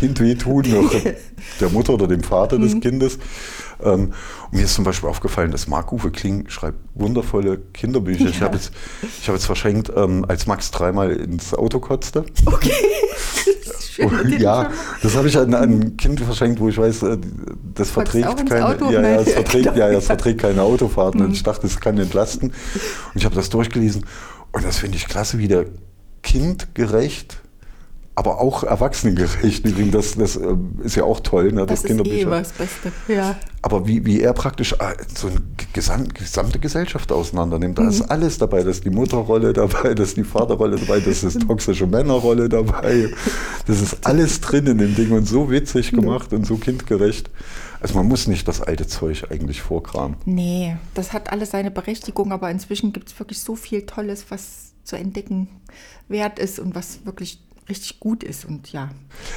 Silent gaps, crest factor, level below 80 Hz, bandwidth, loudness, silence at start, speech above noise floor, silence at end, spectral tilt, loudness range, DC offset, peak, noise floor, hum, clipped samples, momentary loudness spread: none; 14 dB; -28 dBFS; 18.5 kHz; -19 LUFS; 0 s; 20 dB; 0 s; -5.5 dB/octave; 8 LU; under 0.1%; -4 dBFS; -38 dBFS; none; under 0.1%; 12 LU